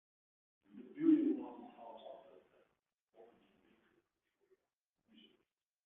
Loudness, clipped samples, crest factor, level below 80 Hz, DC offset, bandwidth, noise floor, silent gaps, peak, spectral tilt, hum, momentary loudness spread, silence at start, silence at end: -35 LUFS; under 0.1%; 22 dB; under -90 dBFS; under 0.1%; 3.8 kHz; under -90 dBFS; none; -20 dBFS; -6.5 dB/octave; none; 25 LU; 0.75 s; 3.7 s